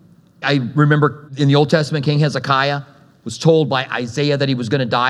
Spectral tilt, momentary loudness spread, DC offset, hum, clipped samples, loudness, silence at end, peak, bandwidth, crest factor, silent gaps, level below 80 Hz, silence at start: -6.5 dB/octave; 7 LU; under 0.1%; none; under 0.1%; -17 LUFS; 0 s; 0 dBFS; 10.5 kHz; 16 dB; none; -64 dBFS; 0.4 s